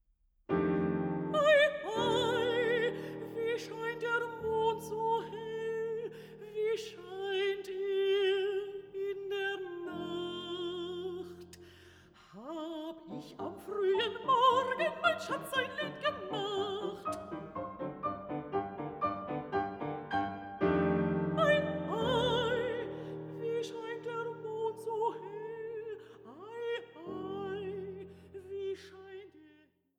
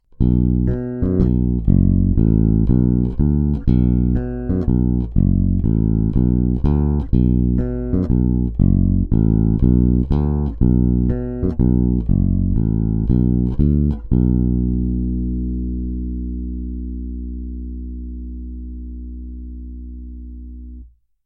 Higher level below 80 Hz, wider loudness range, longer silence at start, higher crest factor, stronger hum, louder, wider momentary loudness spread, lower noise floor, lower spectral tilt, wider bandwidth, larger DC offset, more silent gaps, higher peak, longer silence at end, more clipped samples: second, -66 dBFS vs -22 dBFS; about the same, 11 LU vs 13 LU; first, 0.5 s vs 0.2 s; about the same, 20 dB vs 16 dB; second, none vs 60 Hz at -35 dBFS; second, -34 LUFS vs -18 LUFS; about the same, 14 LU vs 16 LU; first, -66 dBFS vs -41 dBFS; second, -5.5 dB/octave vs -13.5 dB/octave; first, 16 kHz vs 2 kHz; neither; neither; second, -14 dBFS vs 0 dBFS; about the same, 0.5 s vs 0.4 s; neither